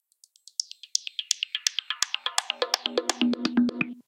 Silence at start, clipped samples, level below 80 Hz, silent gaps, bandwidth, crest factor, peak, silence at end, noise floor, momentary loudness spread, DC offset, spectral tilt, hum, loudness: 0.6 s; under 0.1%; -74 dBFS; none; 16.5 kHz; 26 dB; -4 dBFS; 0.05 s; -57 dBFS; 6 LU; under 0.1%; -1.5 dB/octave; none; -27 LUFS